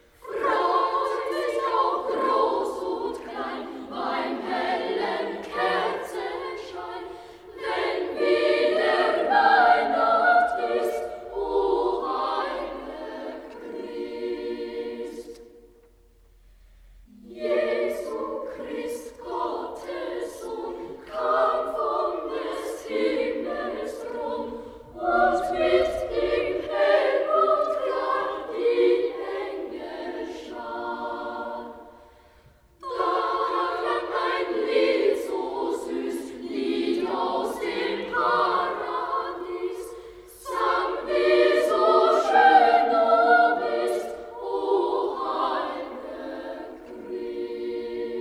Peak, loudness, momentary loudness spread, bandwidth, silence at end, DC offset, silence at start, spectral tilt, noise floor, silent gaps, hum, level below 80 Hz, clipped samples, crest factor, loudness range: -6 dBFS; -25 LUFS; 16 LU; 14.5 kHz; 0 s; under 0.1%; 0.2 s; -4 dB/octave; -56 dBFS; none; none; -56 dBFS; under 0.1%; 20 dB; 11 LU